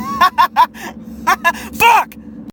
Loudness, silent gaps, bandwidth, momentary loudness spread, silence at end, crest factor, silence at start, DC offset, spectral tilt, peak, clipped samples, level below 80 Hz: -13 LUFS; none; 18 kHz; 19 LU; 0 s; 14 dB; 0 s; under 0.1%; -2.5 dB/octave; 0 dBFS; under 0.1%; -44 dBFS